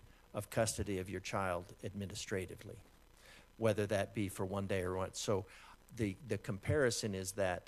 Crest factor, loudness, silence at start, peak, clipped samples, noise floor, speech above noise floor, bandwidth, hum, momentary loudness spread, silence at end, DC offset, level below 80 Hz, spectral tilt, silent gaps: 20 dB; -39 LUFS; 0.05 s; -20 dBFS; under 0.1%; -61 dBFS; 23 dB; 14.5 kHz; none; 14 LU; 0.05 s; under 0.1%; -62 dBFS; -5 dB/octave; none